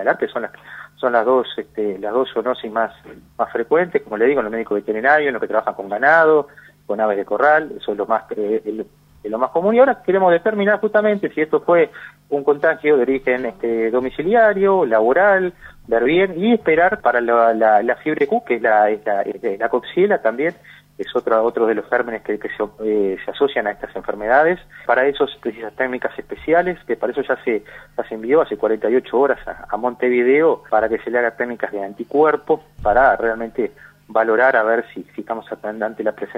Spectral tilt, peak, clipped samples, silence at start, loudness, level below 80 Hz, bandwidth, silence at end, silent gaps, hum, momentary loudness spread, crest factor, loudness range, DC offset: -7.5 dB/octave; 0 dBFS; under 0.1%; 0 s; -18 LUFS; -50 dBFS; 5.6 kHz; 0 s; none; 50 Hz at -55 dBFS; 11 LU; 18 dB; 4 LU; under 0.1%